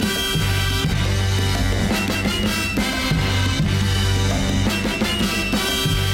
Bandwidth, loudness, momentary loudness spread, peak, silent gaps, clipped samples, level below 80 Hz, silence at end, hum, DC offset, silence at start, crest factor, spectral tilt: 16.5 kHz; -20 LUFS; 1 LU; -8 dBFS; none; under 0.1%; -28 dBFS; 0 s; none; under 0.1%; 0 s; 12 dB; -4.5 dB/octave